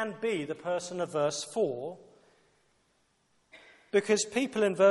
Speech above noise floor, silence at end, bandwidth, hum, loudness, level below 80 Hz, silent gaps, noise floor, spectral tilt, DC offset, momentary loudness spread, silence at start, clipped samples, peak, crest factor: 43 dB; 0 s; 11.5 kHz; none; -30 LUFS; -78 dBFS; none; -72 dBFS; -4 dB/octave; under 0.1%; 8 LU; 0 s; under 0.1%; -12 dBFS; 20 dB